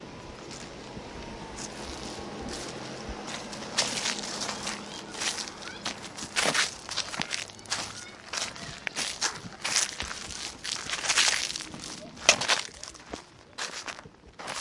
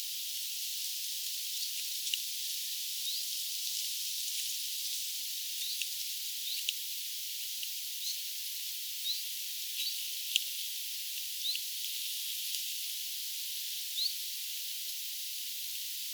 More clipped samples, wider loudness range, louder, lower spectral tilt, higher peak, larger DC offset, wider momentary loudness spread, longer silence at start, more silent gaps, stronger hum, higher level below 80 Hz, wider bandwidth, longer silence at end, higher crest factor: neither; first, 7 LU vs 1 LU; first, -30 LUFS vs -34 LUFS; first, -0.5 dB/octave vs 12 dB/octave; first, 0 dBFS vs -10 dBFS; neither; first, 17 LU vs 3 LU; about the same, 0 s vs 0 s; neither; neither; first, -56 dBFS vs under -90 dBFS; second, 11.5 kHz vs over 20 kHz; about the same, 0 s vs 0 s; about the same, 32 dB vs 28 dB